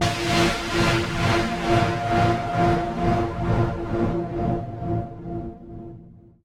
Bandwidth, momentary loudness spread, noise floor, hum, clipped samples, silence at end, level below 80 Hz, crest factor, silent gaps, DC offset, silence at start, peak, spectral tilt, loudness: 16 kHz; 12 LU; -46 dBFS; none; under 0.1%; 0.3 s; -36 dBFS; 16 dB; none; under 0.1%; 0 s; -6 dBFS; -5.5 dB/octave; -23 LUFS